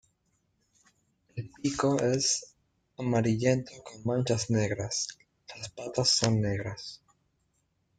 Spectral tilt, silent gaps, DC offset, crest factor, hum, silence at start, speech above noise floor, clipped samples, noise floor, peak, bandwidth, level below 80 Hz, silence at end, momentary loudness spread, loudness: -4.5 dB/octave; none; under 0.1%; 22 dB; none; 1.35 s; 46 dB; under 0.1%; -75 dBFS; -10 dBFS; 9.6 kHz; -62 dBFS; 1.05 s; 17 LU; -29 LUFS